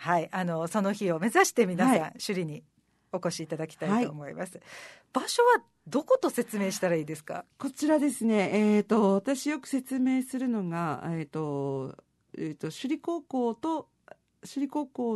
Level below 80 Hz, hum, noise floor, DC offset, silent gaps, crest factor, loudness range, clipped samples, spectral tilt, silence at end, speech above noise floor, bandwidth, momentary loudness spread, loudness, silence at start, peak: -76 dBFS; none; -56 dBFS; under 0.1%; none; 20 dB; 7 LU; under 0.1%; -5 dB/octave; 0 s; 28 dB; 12.5 kHz; 14 LU; -29 LUFS; 0 s; -10 dBFS